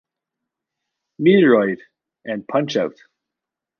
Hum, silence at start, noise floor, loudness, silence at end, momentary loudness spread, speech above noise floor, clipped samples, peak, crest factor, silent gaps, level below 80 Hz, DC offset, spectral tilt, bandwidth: none; 1.2 s; -85 dBFS; -18 LUFS; 0.9 s; 16 LU; 68 dB; under 0.1%; -2 dBFS; 18 dB; none; -68 dBFS; under 0.1%; -7 dB/octave; 6.8 kHz